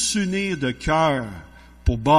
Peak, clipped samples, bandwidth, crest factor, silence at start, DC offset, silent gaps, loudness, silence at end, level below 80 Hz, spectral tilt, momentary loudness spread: -4 dBFS; under 0.1%; 13 kHz; 16 dB; 0 s; under 0.1%; none; -23 LUFS; 0 s; -34 dBFS; -4.5 dB/octave; 11 LU